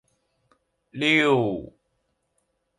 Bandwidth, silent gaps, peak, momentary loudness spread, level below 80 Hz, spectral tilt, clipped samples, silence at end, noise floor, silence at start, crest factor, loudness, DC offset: 11 kHz; none; -6 dBFS; 17 LU; -62 dBFS; -5.5 dB/octave; under 0.1%; 1.1 s; -74 dBFS; 0.95 s; 20 dB; -21 LUFS; under 0.1%